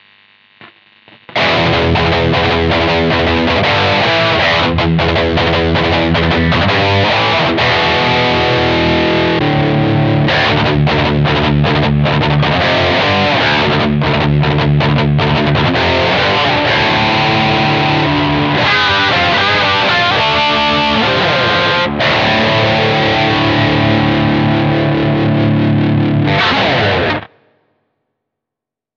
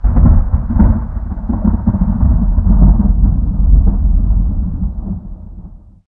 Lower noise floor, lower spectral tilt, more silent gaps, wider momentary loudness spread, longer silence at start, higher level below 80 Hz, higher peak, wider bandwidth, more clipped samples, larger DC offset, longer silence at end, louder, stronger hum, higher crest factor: first, -84 dBFS vs -34 dBFS; second, -6.5 dB/octave vs -14.5 dB/octave; neither; second, 2 LU vs 12 LU; first, 0.6 s vs 0 s; second, -30 dBFS vs -12 dBFS; about the same, 0 dBFS vs 0 dBFS; first, 7.4 kHz vs 1.9 kHz; neither; neither; first, 1.7 s vs 0.3 s; first, -11 LUFS vs -14 LUFS; neither; about the same, 12 dB vs 12 dB